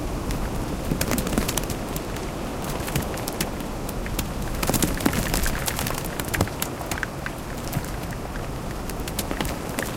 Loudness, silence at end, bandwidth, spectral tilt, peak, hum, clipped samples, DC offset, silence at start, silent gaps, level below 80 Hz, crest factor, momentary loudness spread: -27 LUFS; 0 s; 17 kHz; -4 dB/octave; -4 dBFS; none; under 0.1%; under 0.1%; 0 s; none; -34 dBFS; 24 dB; 8 LU